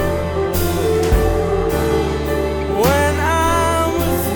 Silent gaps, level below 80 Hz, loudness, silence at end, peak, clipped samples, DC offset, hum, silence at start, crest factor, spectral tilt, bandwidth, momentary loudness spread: none; -24 dBFS; -17 LUFS; 0 s; -2 dBFS; under 0.1%; under 0.1%; none; 0 s; 14 dB; -5.5 dB/octave; over 20 kHz; 4 LU